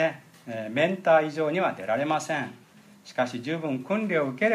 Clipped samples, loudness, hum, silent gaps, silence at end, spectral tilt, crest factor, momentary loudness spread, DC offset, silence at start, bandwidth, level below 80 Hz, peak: under 0.1%; -27 LUFS; none; none; 0 s; -5.5 dB/octave; 18 dB; 14 LU; under 0.1%; 0 s; 14 kHz; -78 dBFS; -8 dBFS